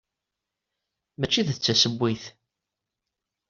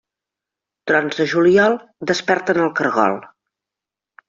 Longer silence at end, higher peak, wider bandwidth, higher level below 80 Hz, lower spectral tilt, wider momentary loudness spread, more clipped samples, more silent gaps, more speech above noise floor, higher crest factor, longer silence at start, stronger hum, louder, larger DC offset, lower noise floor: first, 1.2 s vs 1 s; second, -8 dBFS vs -2 dBFS; about the same, 7.4 kHz vs 7.6 kHz; about the same, -62 dBFS vs -62 dBFS; about the same, -3.5 dB/octave vs -3.5 dB/octave; first, 14 LU vs 9 LU; neither; neither; second, 61 dB vs 70 dB; about the same, 22 dB vs 18 dB; first, 1.2 s vs 0.85 s; second, none vs 50 Hz at -45 dBFS; second, -23 LUFS vs -17 LUFS; neither; about the same, -86 dBFS vs -87 dBFS